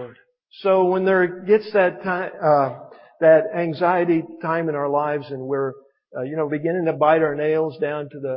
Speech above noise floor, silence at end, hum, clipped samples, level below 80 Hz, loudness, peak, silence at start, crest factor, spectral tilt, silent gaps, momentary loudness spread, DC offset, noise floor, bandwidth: 25 dB; 0 s; none; under 0.1%; -70 dBFS; -20 LUFS; -2 dBFS; 0 s; 18 dB; -11.5 dB/octave; none; 10 LU; under 0.1%; -44 dBFS; 5.6 kHz